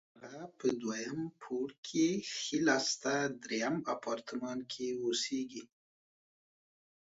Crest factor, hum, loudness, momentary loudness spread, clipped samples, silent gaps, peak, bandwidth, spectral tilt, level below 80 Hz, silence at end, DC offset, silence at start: 22 dB; none; -36 LUFS; 10 LU; under 0.1%; 1.78-1.83 s; -14 dBFS; 7.6 kHz; -3 dB/octave; -78 dBFS; 1.55 s; under 0.1%; 0.15 s